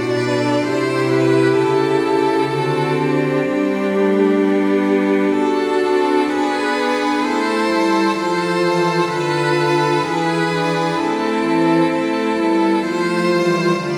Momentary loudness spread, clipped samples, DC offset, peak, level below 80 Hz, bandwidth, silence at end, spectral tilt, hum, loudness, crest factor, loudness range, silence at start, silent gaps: 3 LU; under 0.1%; under 0.1%; -4 dBFS; -58 dBFS; 12.5 kHz; 0 s; -6 dB/octave; none; -17 LUFS; 12 dB; 1 LU; 0 s; none